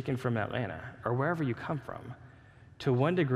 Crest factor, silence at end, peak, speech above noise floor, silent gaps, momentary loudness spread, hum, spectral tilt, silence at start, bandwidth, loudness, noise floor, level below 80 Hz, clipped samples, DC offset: 18 dB; 0 s; -14 dBFS; 24 dB; none; 16 LU; none; -8 dB/octave; 0 s; 11.5 kHz; -32 LUFS; -55 dBFS; -64 dBFS; under 0.1%; under 0.1%